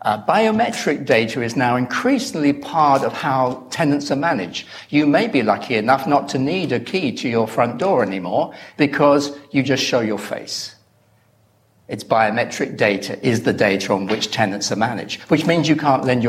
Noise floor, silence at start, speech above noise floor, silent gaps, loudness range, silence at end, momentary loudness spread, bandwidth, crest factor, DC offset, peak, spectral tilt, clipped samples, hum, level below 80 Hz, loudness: -57 dBFS; 0.05 s; 39 dB; none; 3 LU; 0 s; 7 LU; 15 kHz; 18 dB; under 0.1%; -2 dBFS; -5 dB/octave; under 0.1%; none; -60 dBFS; -19 LUFS